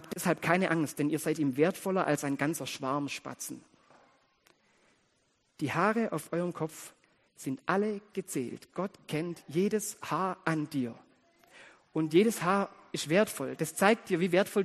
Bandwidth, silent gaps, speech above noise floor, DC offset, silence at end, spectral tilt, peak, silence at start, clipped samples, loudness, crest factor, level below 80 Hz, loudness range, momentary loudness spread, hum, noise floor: 13 kHz; none; 42 dB; under 0.1%; 0 s; -5 dB/octave; -8 dBFS; 0 s; under 0.1%; -31 LUFS; 24 dB; -74 dBFS; 6 LU; 11 LU; none; -73 dBFS